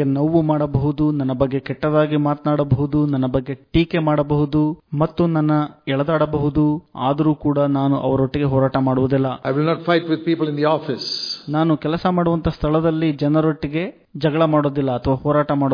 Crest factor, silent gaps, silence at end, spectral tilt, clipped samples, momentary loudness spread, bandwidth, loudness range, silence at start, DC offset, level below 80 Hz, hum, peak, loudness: 16 dB; none; 0 s; -8.5 dB/octave; under 0.1%; 5 LU; 5.2 kHz; 1 LU; 0 s; under 0.1%; -40 dBFS; none; -4 dBFS; -19 LUFS